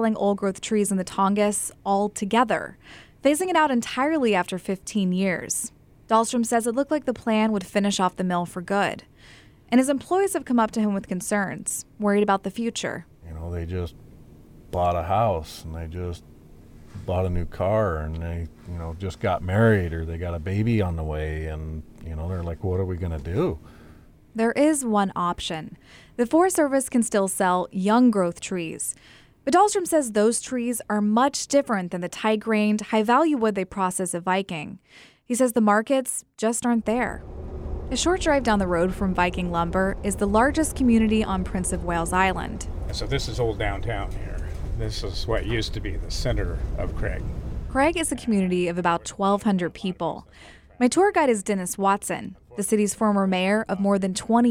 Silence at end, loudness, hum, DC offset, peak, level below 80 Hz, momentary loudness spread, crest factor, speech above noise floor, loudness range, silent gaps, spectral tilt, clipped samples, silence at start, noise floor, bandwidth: 0 s; -24 LUFS; none; under 0.1%; -6 dBFS; -38 dBFS; 12 LU; 18 dB; 26 dB; 6 LU; none; -5 dB/octave; under 0.1%; 0 s; -50 dBFS; 16.5 kHz